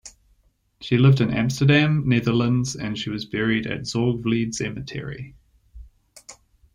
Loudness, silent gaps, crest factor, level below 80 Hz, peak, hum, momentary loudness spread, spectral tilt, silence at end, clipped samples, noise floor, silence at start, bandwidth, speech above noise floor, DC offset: -22 LUFS; none; 18 dB; -48 dBFS; -6 dBFS; none; 15 LU; -6 dB/octave; 0.4 s; under 0.1%; -63 dBFS; 0.05 s; 11.5 kHz; 42 dB; under 0.1%